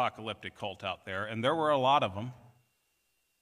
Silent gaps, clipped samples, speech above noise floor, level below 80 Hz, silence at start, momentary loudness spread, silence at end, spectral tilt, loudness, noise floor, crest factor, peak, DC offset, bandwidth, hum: none; under 0.1%; 45 dB; -76 dBFS; 0 s; 14 LU; 1.05 s; -5.5 dB/octave; -31 LUFS; -77 dBFS; 20 dB; -14 dBFS; under 0.1%; 14.5 kHz; none